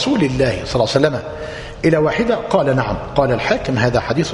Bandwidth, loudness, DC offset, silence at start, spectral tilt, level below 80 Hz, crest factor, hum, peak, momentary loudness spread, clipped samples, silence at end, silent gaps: 11 kHz; -17 LUFS; under 0.1%; 0 s; -6 dB/octave; -36 dBFS; 16 dB; none; 0 dBFS; 5 LU; under 0.1%; 0 s; none